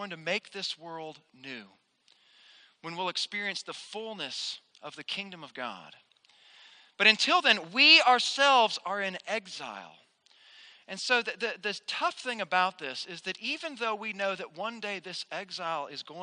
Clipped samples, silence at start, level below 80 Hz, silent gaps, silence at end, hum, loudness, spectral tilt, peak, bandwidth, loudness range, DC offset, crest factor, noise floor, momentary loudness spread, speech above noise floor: under 0.1%; 0 s; -88 dBFS; none; 0 s; none; -28 LUFS; -1.5 dB/octave; -6 dBFS; 10 kHz; 14 LU; under 0.1%; 26 dB; -66 dBFS; 20 LU; 36 dB